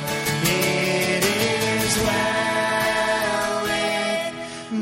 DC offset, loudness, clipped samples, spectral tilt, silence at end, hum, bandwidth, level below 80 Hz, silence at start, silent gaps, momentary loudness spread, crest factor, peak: under 0.1%; -21 LUFS; under 0.1%; -3.5 dB/octave; 0 s; none; 16.5 kHz; -48 dBFS; 0 s; none; 4 LU; 16 dB; -6 dBFS